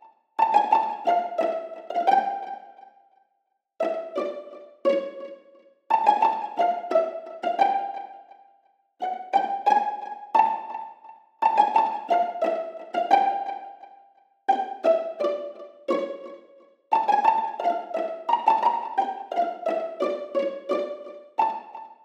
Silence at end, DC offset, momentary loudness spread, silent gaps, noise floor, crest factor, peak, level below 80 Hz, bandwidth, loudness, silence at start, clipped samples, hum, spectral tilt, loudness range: 0.1 s; under 0.1%; 16 LU; none; -75 dBFS; 20 dB; -6 dBFS; under -90 dBFS; 8.2 kHz; -25 LUFS; 0.4 s; under 0.1%; none; -4.5 dB/octave; 4 LU